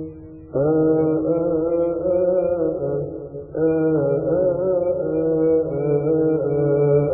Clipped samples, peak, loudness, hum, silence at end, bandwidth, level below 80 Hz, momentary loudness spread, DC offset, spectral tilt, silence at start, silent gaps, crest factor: under 0.1%; -6 dBFS; -20 LUFS; none; 0 s; 2.6 kHz; -48 dBFS; 8 LU; under 0.1%; -15.5 dB/octave; 0 s; none; 14 dB